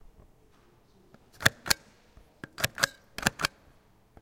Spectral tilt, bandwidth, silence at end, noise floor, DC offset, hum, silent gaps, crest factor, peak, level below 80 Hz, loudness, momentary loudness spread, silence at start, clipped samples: -2 dB/octave; 17 kHz; 0.75 s; -61 dBFS; under 0.1%; none; none; 34 dB; -2 dBFS; -54 dBFS; -29 LUFS; 6 LU; 1.4 s; under 0.1%